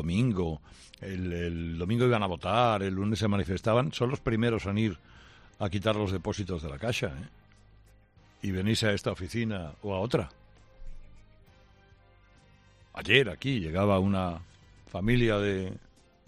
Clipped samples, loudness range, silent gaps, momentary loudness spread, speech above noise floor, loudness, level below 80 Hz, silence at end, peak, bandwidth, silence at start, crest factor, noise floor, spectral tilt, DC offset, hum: under 0.1%; 6 LU; none; 14 LU; 30 dB; -29 LUFS; -50 dBFS; 0.5 s; -6 dBFS; 13.5 kHz; 0 s; 24 dB; -59 dBFS; -6 dB/octave; under 0.1%; none